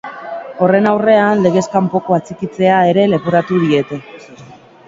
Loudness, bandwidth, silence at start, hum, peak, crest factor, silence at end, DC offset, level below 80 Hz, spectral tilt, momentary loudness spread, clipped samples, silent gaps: -13 LUFS; 7.8 kHz; 0.05 s; none; 0 dBFS; 14 dB; 0.35 s; under 0.1%; -56 dBFS; -7 dB/octave; 14 LU; under 0.1%; none